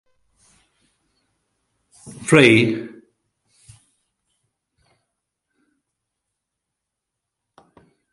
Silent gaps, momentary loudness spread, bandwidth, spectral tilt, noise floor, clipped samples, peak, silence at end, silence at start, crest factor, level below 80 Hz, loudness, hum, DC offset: none; 27 LU; 11.5 kHz; -5 dB/octave; -82 dBFS; under 0.1%; 0 dBFS; 5.25 s; 2.05 s; 24 dB; -60 dBFS; -15 LUFS; none; under 0.1%